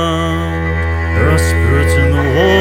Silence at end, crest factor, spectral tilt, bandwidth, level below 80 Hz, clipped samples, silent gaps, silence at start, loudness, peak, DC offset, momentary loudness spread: 0 s; 12 dB; -6 dB/octave; 15.5 kHz; -20 dBFS; under 0.1%; none; 0 s; -13 LUFS; 0 dBFS; under 0.1%; 5 LU